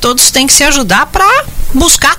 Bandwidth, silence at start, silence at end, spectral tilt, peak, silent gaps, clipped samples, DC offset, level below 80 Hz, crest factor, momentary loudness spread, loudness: over 20 kHz; 0 s; 0 s; -1.5 dB/octave; 0 dBFS; none; 0.5%; under 0.1%; -20 dBFS; 8 dB; 6 LU; -7 LUFS